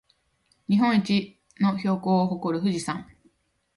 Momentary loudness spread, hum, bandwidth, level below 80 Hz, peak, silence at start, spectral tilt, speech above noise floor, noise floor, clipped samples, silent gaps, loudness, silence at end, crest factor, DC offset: 13 LU; none; 11.5 kHz; -64 dBFS; -12 dBFS; 0.7 s; -6.5 dB/octave; 45 dB; -68 dBFS; under 0.1%; none; -25 LUFS; 0.75 s; 14 dB; under 0.1%